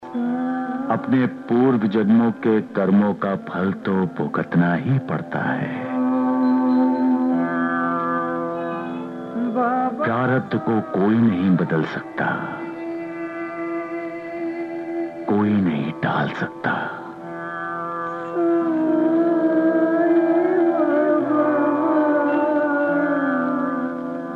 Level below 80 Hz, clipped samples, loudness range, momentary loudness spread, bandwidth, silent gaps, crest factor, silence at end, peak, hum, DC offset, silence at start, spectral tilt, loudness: -66 dBFS; under 0.1%; 6 LU; 11 LU; 5.8 kHz; none; 14 dB; 0 s; -6 dBFS; none; under 0.1%; 0 s; -9.5 dB/octave; -21 LUFS